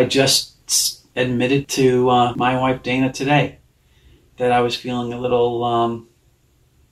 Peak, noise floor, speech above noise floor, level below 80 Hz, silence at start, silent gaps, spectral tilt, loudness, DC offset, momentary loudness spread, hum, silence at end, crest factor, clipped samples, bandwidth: -2 dBFS; -58 dBFS; 40 dB; -50 dBFS; 0 s; none; -4 dB/octave; -18 LUFS; under 0.1%; 8 LU; none; 0.9 s; 18 dB; under 0.1%; 14.5 kHz